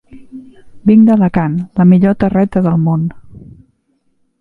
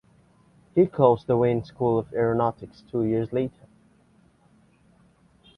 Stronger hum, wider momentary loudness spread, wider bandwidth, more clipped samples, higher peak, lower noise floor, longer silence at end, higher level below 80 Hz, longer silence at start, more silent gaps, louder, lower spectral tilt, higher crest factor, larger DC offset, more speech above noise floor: neither; about the same, 9 LU vs 9 LU; second, 4.3 kHz vs 5.6 kHz; neither; first, 0 dBFS vs -4 dBFS; about the same, -60 dBFS vs -60 dBFS; second, 1.05 s vs 2.1 s; first, -42 dBFS vs -58 dBFS; second, 0.15 s vs 0.75 s; neither; first, -12 LUFS vs -24 LUFS; about the same, -11 dB/octave vs -10 dB/octave; second, 12 dB vs 22 dB; neither; first, 50 dB vs 37 dB